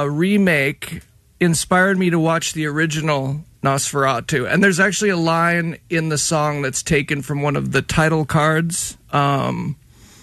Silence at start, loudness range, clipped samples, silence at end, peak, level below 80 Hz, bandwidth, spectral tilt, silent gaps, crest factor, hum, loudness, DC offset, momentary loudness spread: 0 s; 1 LU; under 0.1%; 0.5 s; -2 dBFS; -44 dBFS; 13.5 kHz; -4.5 dB/octave; none; 16 dB; none; -18 LUFS; under 0.1%; 7 LU